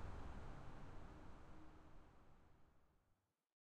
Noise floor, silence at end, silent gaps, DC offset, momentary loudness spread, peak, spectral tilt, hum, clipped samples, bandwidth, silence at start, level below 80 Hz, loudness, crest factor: -84 dBFS; 0.6 s; none; under 0.1%; 11 LU; -40 dBFS; -7 dB/octave; none; under 0.1%; 9.4 kHz; 0 s; -60 dBFS; -61 LUFS; 16 dB